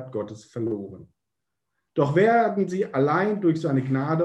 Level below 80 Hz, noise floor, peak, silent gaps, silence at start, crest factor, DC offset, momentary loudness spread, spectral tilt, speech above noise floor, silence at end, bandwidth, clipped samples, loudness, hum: -66 dBFS; -84 dBFS; -8 dBFS; none; 0 s; 16 dB; under 0.1%; 14 LU; -8 dB/octave; 61 dB; 0 s; 9 kHz; under 0.1%; -24 LUFS; none